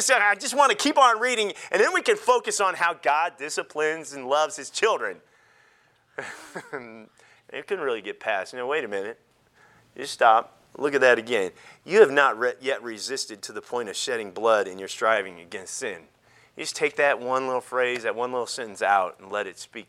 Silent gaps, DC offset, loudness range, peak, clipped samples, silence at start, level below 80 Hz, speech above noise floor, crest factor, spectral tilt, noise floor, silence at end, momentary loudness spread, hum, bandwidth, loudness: none; under 0.1%; 10 LU; -2 dBFS; under 0.1%; 0 s; -76 dBFS; 37 dB; 22 dB; -1.5 dB/octave; -62 dBFS; 0.05 s; 17 LU; none; 15 kHz; -24 LUFS